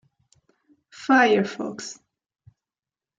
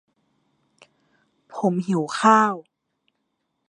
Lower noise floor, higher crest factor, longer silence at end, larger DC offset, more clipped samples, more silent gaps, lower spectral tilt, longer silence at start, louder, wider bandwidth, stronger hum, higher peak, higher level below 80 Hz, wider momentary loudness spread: first, under -90 dBFS vs -75 dBFS; about the same, 20 dB vs 22 dB; first, 1.25 s vs 1.1 s; neither; neither; neither; about the same, -4.5 dB/octave vs -5.5 dB/octave; second, 1 s vs 1.55 s; about the same, -21 LUFS vs -20 LUFS; second, 9.2 kHz vs 11 kHz; neither; second, -6 dBFS vs -2 dBFS; first, -72 dBFS vs -78 dBFS; first, 19 LU vs 16 LU